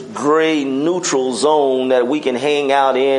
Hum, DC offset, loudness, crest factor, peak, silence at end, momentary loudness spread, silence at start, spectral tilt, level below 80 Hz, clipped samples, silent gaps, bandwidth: none; under 0.1%; -16 LUFS; 14 dB; -2 dBFS; 0 s; 3 LU; 0 s; -3.5 dB/octave; -70 dBFS; under 0.1%; none; 11 kHz